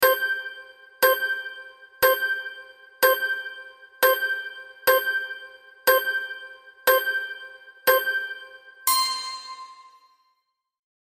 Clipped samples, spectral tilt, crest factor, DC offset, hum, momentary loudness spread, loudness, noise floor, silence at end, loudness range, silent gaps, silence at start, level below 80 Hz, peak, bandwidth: under 0.1%; 0.5 dB/octave; 20 dB; under 0.1%; none; 21 LU; -23 LUFS; -75 dBFS; 1.2 s; 2 LU; none; 0 s; -74 dBFS; -4 dBFS; 15.5 kHz